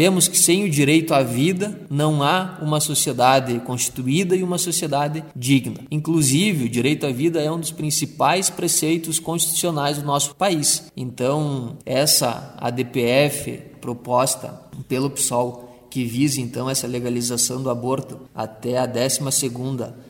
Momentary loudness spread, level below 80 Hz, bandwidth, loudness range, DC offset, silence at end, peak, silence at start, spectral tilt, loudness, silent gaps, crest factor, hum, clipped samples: 11 LU; -58 dBFS; 17 kHz; 4 LU; under 0.1%; 0 s; -2 dBFS; 0 s; -4 dB/octave; -20 LUFS; none; 20 dB; none; under 0.1%